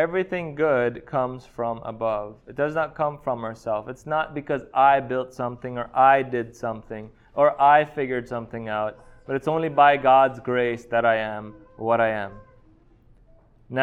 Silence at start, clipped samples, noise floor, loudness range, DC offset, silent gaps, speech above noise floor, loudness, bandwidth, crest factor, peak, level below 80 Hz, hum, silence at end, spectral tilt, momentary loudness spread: 0 s; under 0.1%; -55 dBFS; 6 LU; under 0.1%; none; 32 dB; -23 LUFS; 8.2 kHz; 20 dB; -4 dBFS; -56 dBFS; none; 0 s; -7 dB/octave; 14 LU